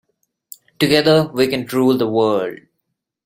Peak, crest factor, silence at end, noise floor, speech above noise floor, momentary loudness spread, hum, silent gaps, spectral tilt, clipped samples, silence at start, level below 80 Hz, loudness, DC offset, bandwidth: 0 dBFS; 18 dB; 0.7 s; -75 dBFS; 60 dB; 7 LU; none; none; -5.5 dB/octave; under 0.1%; 0.8 s; -56 dBFS; -16 LUFS; under 0.1%; 16.5 kHz